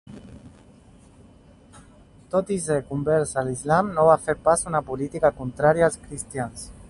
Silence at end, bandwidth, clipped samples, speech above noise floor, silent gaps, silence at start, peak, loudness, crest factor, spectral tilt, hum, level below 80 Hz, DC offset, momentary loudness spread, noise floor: 0.05 s; 11.5 kHz; under 0.1%; 29 dB; none; 0.1 s; -4 dBFS; -23 LUFS; 22 dB; -5.5 dB/octave; none; -50 dBFS; under 0.1%; 13 LU; -51 dBFS